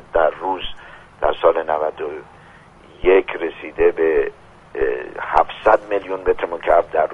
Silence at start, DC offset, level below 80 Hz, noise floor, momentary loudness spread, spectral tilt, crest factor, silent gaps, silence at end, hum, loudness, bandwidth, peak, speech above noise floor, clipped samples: 0.15 s; under 0.1%; -40 dBFS; -45 dBFS; 11 LU; -6 dB/octave; 20 dB; none; 0 s; none; -19 LUFS; 6.8 kHz; 0 dBFS; 27 dB; under 0.1%